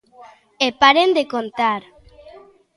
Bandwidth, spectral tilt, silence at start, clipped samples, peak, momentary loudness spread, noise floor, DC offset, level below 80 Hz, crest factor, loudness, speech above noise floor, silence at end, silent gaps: 11.5 kHz; -3 dB/octave; 0.25 s; under 0.1%; 0 dBFS; 11 LU; -45 dBFS; under 0.1%; -58 dBFS; 20 dB; -17 LUFS; 27 dB; 0.95 s; none